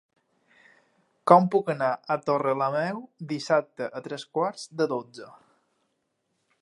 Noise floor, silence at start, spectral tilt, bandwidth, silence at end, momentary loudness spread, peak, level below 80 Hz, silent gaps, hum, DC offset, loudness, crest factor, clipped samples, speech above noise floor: -76 dBFS; 1.25 s; -6.5 dB/octave; 11.5 kHz; 1.3 s; 16 LU; -2 dBFS; -80 dBFS; none; none; under 0.1%; -26 LUFS; 26 dB; under 0.1%; 51 dB